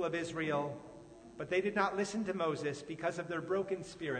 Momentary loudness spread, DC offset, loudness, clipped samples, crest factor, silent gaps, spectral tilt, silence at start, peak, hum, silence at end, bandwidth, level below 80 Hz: 14 LU; under 0.1%; -36 LUFS; under 0.1%; 20 dB; none; -5.5 dB/octave; 0 s; -18 dBFS; none; 0 s; 9.6 kHz; -70 dBFS